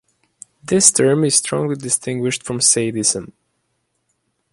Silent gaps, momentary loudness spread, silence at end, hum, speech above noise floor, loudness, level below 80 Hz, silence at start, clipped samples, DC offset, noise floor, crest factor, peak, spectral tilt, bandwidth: none; 10 LU; 1.25 s; none; 52 dB; -16 LUFS; -56 dBFS; 0.65 s; under 0.1%; under 0.1%; -70 dBFS; 20 dB; 0 dBFS; -3 dB/octave; 14.5 kHz